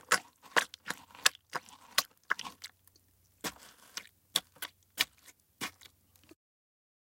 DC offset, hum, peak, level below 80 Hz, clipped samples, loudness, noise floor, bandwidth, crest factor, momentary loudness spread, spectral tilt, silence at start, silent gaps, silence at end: under 0.1%; none; -2 dBFS; -76 dBFS; under 0.1%; -35 LUFS; -68 dBFS; 17 kHz; 38 dB; 16 LU; 0.5 dB/octave; 0.1 s; none; 1.5 s